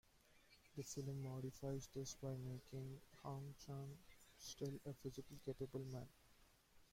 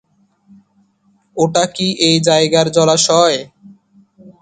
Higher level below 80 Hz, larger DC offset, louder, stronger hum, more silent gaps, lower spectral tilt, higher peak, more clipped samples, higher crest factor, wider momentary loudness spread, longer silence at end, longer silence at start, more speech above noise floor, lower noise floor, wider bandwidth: second, -72 dBFS vs -58 dBFS; neither; second, -52 LUFS vs -13 LUFS; neither; neither; first, -6 dB/octave vs -3.5 dB/octave; second, -36 dBFS vs 0 dBFS; neither; about the same, 16 dB vs 16 dB; about the same, 8 LU vs 7 LU; about the same, 0.05 s vs 0.1 s; second, 0.15 s vs 1.35 s; second, 22 dB vs 45 dB; first, -73 dBFS vs -58 dBFS; first, 16.5 kHz vs 9.6 kHz